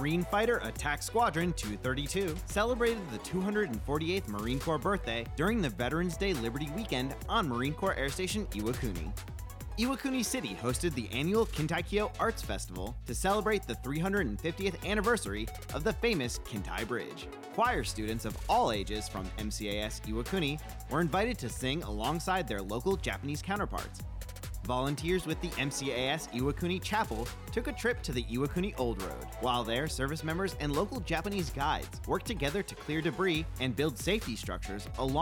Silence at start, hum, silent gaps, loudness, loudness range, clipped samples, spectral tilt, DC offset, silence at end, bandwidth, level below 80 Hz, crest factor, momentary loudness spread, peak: 0 s; none; none; -33 LUFS; 2 LU; under 0.1%; -5 dB/octave; under 0.1%; 0 s; 18.5 kHz; -44 dBFS; 16 dB; 8 LU; -18 dBFS